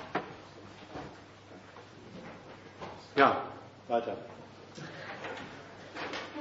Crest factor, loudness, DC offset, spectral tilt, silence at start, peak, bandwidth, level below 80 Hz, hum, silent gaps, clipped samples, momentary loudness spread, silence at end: 28 dB; -34 LUFS; under 0.1%; -2.5 dB/octave; 0 s; -8 dBFS; 7.6 kHz; -70 dBFS; none; none; under 0.1%; 24 LU; 0 s